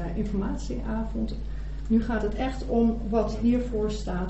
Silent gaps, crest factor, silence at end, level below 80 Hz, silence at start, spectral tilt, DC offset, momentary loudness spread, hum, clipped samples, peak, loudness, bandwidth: none; 16 dB; 0 s; -32 dBFS; 0 s; -7.5 dB/octave; under 0.1%; 8 LU; none; under 0.1%; -12 dBFS; -28 LUFS; 8.2 kHz